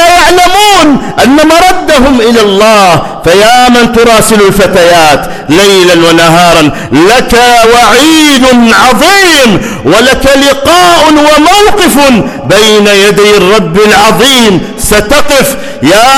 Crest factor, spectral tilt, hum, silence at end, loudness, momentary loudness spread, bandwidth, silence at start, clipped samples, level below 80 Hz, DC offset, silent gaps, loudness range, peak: 4 dB; -3.5 dB/octave; none; 0 s; -3 LUFS; 4 LU; over 20 kHz; 0 s; 6%; -24 dBFS; under 0.1%; none; 1 LU; 0 dBFS